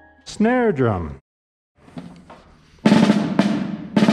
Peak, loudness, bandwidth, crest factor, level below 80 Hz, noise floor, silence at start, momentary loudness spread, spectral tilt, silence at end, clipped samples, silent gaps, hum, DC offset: -2 dBFS; -19 LUFS; 11 kHz; 18 dB; -48 dBFS; -49 dBFS; 0.25 s; 23 LU; -6.5 dB/octave; 0 s; under 0.1%; 1.21-1.75 s; none; under 0.1%